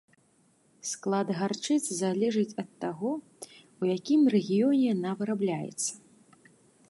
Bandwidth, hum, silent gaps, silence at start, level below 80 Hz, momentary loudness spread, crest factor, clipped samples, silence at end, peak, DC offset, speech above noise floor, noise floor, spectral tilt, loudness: 12 kHz; none; none; 0.85 s; -78 dBFS; 13 LU; 16 dB; under 0.1%; 0.9 s; -14 dBFS; under 0.1%; 38 dB; -66 dBFS; -5 dB/octave; -29 LUFS